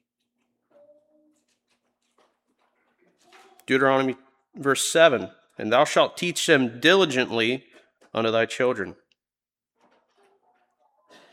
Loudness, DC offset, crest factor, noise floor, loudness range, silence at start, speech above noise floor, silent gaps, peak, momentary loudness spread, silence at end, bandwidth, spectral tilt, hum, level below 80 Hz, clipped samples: -22 LUFS; under 0.1%; 22 dB; under -90 dBFS; 9 LU; 3.7 s; over 68 dB; none; -4 dBFS; 14 LU; 2.4 s; 16.5 kHz; -3.5 dB/octave; none; -76 dBFS; under 0.1%